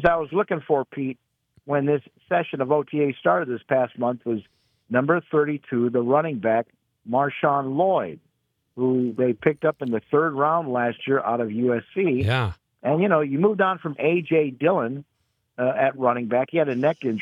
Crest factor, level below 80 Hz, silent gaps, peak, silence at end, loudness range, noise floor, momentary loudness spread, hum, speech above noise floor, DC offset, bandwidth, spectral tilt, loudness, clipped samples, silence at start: 20 dB; -60 dBFS; none; -4 dBFS; 0 s; 2 LU; -72 dBFS; 7 LU; none; 50 dB; under 0.1%; 10 kHz; -9 dB/octave; -23 LUFS; under 0.1%; 0 s